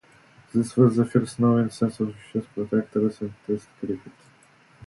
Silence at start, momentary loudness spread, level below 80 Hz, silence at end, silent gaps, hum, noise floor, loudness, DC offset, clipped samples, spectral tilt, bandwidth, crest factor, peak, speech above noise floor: 0.55 s; 13 LU; -60 dBFS; 0.75 s; none; none; -56 dBFS; -25 LUFS; under 0.1%; under 0.1%; -8 dB/octave; 11.5 kHz; 20 dB; -4 dBFS; 33 dB